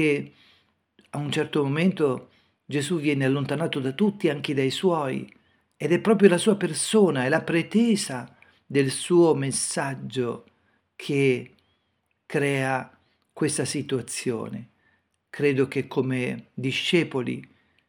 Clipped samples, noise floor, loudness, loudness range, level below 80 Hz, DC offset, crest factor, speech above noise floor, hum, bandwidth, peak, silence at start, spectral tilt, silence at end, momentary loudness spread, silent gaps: under 0.1%; -73 dBFS; -24 LUFS; 6 LU; -72 dBFS; under 0.1%; 22 dB; 50 dB; none; 18 kHz; -2 dBFS; 0 s; -5 dB/octave; 0.45 s; 12 LU; none